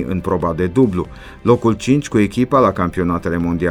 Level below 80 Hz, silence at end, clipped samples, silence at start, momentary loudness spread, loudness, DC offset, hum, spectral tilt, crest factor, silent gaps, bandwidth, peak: -38 dBFS; 0 s; under 0.1%; 0 s; 6 LU; -17 LUFS; under 0.1%; none; -7.5 dB/octave; 16 dB; none; 13.5 kHz; 0 dBFS